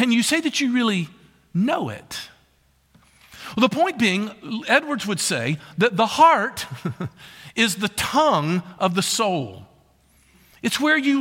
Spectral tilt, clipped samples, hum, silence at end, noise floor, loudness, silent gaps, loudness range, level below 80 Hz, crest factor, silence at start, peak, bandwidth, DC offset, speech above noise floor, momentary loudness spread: -4 dB/octave; under 0.1%; none; 0 s; -61 dBFS; -21 LUFS; none; 5 LU; -60 dBFS; 20 dB; 0 s; -2 dBFS; 17 kHz; under 0.1%; 40 dB; 14 LU